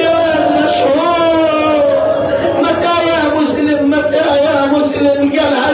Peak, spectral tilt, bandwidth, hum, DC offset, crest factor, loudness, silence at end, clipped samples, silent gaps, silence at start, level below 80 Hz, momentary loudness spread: -2 dBFS; -9 dB/octave; 4 kHz; none; under 0.1%; 10 dB; -12 LUFS; 0 s; under 0.1%; none; 0 s; -42 dBFS; 2 LU